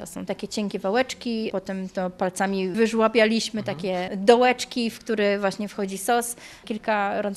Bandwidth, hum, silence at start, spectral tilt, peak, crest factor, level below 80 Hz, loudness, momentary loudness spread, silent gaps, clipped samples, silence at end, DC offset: 14.5 kHz; none; 0 s; -4.5 dB/octave; -2 dBFS; 22 dB; -60 dBFS; -24 LUFS; 11 LU; none; under 0.1%; 0 s; under 0.1%